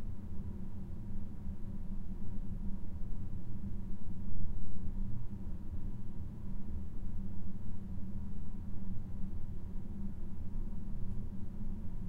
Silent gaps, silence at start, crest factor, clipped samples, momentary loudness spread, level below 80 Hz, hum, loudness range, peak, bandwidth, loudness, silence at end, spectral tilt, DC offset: none; 0 s; 14 dB; under 0.1%; 2 LU; -40 dBFS; none; 1 LU; -18 dBFS; 1.9 kHz; -46 LUFS; 0 s; -9.5 dB/octave; under 0.1%